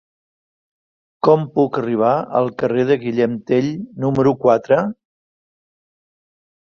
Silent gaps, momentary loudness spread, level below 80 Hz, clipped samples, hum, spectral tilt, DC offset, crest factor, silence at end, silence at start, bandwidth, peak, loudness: none; 5 LU; -58 dBFS; under 0.1%; none; -8.5 dB/octave; under 0.1%; 18 dB; 1.7 s; 1.25 s; 7 kHz; -2 dBFS; -18 LUFS